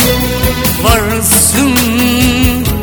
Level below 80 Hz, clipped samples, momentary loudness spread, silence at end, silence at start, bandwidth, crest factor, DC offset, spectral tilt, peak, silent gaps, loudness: -20 dBFS; 0.3%; 5 LU; 0 s; 0 s; over 20 kHz; 10 dB; under 0.1%; -3.5 dB/octave; 0 dBFS; none; -9 LUFS